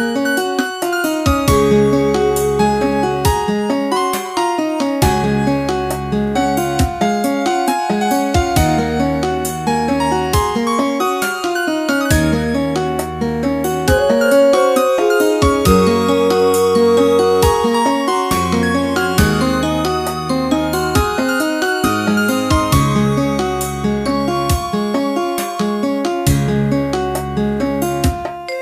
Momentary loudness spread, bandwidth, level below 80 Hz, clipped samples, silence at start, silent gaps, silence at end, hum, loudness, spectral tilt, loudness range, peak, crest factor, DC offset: 6 LU; 15.5 kHz; -30 dBFS; under 0.1%; 0 s; none; 0 s; none; -16 LUFS; -5.5 dB/octave; 4 LU; 0 dBFS; 16 dB; under 0.1%